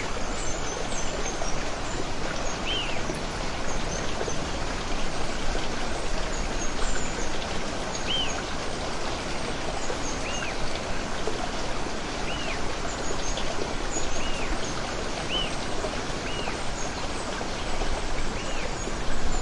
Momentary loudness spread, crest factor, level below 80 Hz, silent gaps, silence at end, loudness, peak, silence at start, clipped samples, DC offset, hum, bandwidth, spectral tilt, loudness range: 3 LU; 14 dB; -34 dBFS; none; 0 s; -30 LUFS; -12 dBFS; 0 s; under 0.1%; under 0.1%; none; 11 kHz; -3 dB/octave; 1 LU